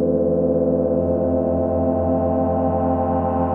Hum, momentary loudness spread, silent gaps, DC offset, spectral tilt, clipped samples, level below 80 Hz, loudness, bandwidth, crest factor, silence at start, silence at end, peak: none; 1 LU; none; under 0.1%; -12.5 dB/octave; under 0.1%; -44 dBFS; -20 LUFS; 3 kHz; 12 dB; 0 s; 0 s; -6 dBFS